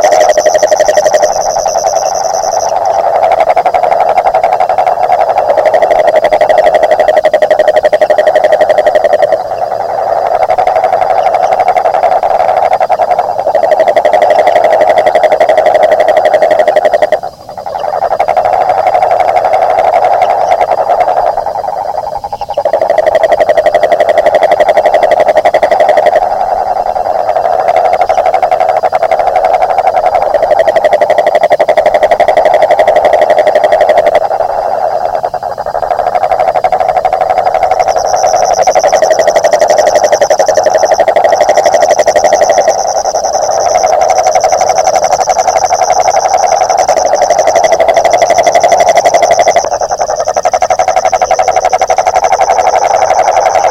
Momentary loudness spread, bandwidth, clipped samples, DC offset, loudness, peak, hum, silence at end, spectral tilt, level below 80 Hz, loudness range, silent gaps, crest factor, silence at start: 5 LU; 15.5 kHz; 1%; under 0.1%; -8 LUFS; 0 dBFS; none; 0 s; -2 dB/octave; -40 dBFS; 3 LU; none; 8 dB; 0 s